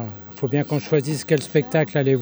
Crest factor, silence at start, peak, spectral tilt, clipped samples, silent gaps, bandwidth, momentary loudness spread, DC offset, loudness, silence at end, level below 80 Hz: 16 dB; 0 s; -4 dBFS; -6.5 dB/octave; under 0.1%; none; over 20 kHz; 5 LU; under 0.1%; -22 LUFS; 0 s; -64 dBFS